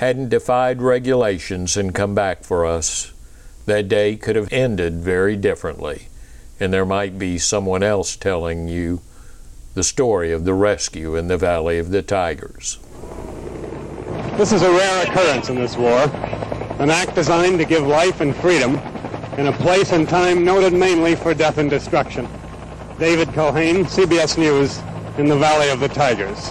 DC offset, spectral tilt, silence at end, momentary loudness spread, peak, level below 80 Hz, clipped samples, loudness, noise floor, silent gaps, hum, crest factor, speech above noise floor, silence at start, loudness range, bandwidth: under 0.1%; -4.5 dB/octave; 0 s; 14 LU; -6 dBFS; -38 dBFS; under 0.1%; -18 LUFS; -39 dBFS; none; none; 12 dB; 22 dB; 0 s; 5 LU; 13 kHz